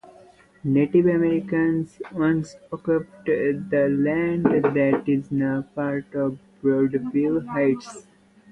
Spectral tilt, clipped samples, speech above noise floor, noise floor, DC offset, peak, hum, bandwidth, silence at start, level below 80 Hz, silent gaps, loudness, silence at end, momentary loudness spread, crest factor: -8.5 dB/octave; under 0.1%; 30 dB; -52 dBFS; under 0.1%; -4 dBFS; none; 9 kHz; 0.65 s; -58 dBFS; none; -23 LUFS; 0.5 s; 8 LU; 18 dB